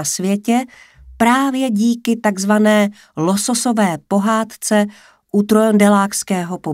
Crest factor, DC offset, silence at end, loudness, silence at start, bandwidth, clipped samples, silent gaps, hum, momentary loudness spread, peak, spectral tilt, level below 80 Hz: 16 dB; under 0.1%; 0 s; -16 LUFS; 0 s; 16 kHz; under 0.1%; none; none; 8 LU; 0 dBFS; -4.5 dB/octave; -54 dBFS